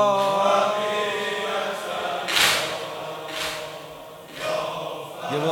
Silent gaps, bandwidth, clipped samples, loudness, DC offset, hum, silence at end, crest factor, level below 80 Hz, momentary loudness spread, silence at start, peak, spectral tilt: none; 19 kHz; under 0.1%; -24 LUFS; under 0.1%; none; 0 s; 20 dB; -62 dBFS; 14 LU; 0 s; -4 dBFS; -2 dB/octave